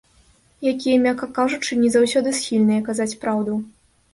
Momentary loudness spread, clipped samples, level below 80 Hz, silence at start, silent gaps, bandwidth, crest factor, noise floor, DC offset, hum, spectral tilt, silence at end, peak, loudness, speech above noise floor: 8 LU; under 0.1%; -58 dBFS; 0.6 s; none; 11.5 kHz; 16 dB; -56 dBFS; under 0.1%; none; -4.5 dB/octave; 0.45 s; -6 dBFS; -20 LUFS; 37 dB